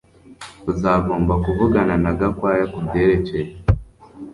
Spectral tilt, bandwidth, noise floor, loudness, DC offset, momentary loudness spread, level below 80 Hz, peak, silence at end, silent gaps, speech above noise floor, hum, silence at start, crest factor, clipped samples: -8.5 dB/octave; 11.5 kHz; -39 dBFS; -19 LUFS; under 0.1%; 10 LU; -32 dBFS; -2 dBFS; 0 s; none; 20 dB; none; 0.3 s; 16 dB; under 0.1%